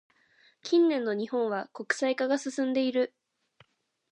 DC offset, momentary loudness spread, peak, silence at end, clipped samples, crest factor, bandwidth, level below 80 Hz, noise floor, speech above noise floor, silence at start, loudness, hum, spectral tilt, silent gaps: under 0.1%; 8 LU; -10 dBFS; 1.05 s; under 0.1%; 20 dB; 9.8 kHz; -86 dBFS; -65 dBFS; 37 dB; 0.65 s; -28 LUFS; none; -4 dB/octave; none